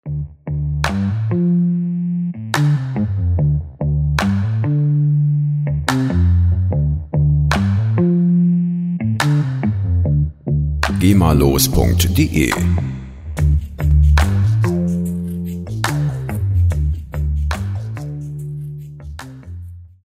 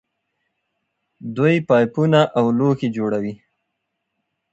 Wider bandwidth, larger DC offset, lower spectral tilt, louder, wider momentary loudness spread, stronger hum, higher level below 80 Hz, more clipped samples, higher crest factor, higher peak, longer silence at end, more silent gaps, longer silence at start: first, 16 kHz vs 8 kHz; neither; second, -6.5 dB/octave vs -8 dB/octave; about the same, -17 LUFS vs -18 LUFS; about the same, 13 LU vs 13 LU; neither; first, -24 dBFS vs -62 dBFS; neither; about the same, 16 dB vs 18 dB; about the same, 0 dBFS vs -2 dBFS; second, 0.2 s vs 1.15 s; neither; second, 0.05 s vs 1.2 s